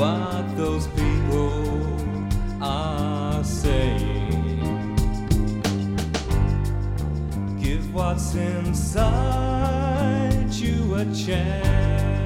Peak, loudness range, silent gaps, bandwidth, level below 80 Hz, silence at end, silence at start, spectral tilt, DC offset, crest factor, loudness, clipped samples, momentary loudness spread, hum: -6 dBFS; 2 LU; none; 15 kHz; -28 dBFS; 0 s; 0 s; -6.5 dB/octave; under 0.1%; 16 dB; -24 LUFS; under 0.1%; 5 LU; none